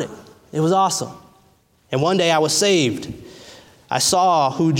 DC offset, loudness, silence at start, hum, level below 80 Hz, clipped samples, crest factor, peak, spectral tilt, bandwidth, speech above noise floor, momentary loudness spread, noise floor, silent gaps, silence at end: under 0.1%; -18 LUFS; 0 s; none; -56 dBFS; under 0.1%; 16 dB; -4 dBFS; -4 dB/octave; 17 kHz; 39 dB; 15 LU; -57 dBFS; none; 0 s